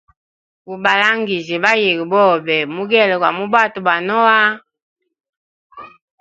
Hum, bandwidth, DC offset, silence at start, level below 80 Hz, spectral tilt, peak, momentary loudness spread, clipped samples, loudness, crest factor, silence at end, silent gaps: none; 8 kHz; under 0.1%; 0.7 s; -66 dBFS; -4.5 dB/octave; 0 dBFS; 6 LU; under 0.1%; -14 LUFS; 16 dB; 0.35 s; 4.82-4.96 s, 5.29-5.70 s